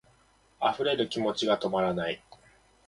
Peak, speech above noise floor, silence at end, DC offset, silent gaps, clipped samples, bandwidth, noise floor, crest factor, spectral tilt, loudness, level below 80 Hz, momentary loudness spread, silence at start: -12 dBFS; 36 dB; 0.7 s; under 0.1%; none; under 0.1%; 11.5 kHz; -64 dBFS; 18 dB; -5 dB/octave; -29 LUFS; -64 dBFS; 6 LU; 0.6 s